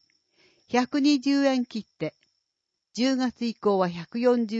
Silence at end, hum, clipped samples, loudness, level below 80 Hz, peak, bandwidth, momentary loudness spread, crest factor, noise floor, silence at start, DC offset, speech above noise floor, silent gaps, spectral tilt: 0 s; none; under 0.1%; -26 LUFS; -70 dBFS; -10 dBFS; 8 kHz; 12 LU; 16 dB; -82 dBFS; 0.7 s; under 0.1%; 58 dB; none; -5 dB/octave